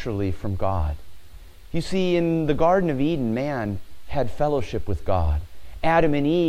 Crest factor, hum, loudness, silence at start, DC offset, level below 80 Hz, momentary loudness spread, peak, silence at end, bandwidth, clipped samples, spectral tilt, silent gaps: 16 dB; none; -24 LUFS; 0 s; under 0.1%; -34 dBFS; 11 LU; -6 dBFS; 0 s; 15 kHz; under 0.1%; -7.5 dB/octave; none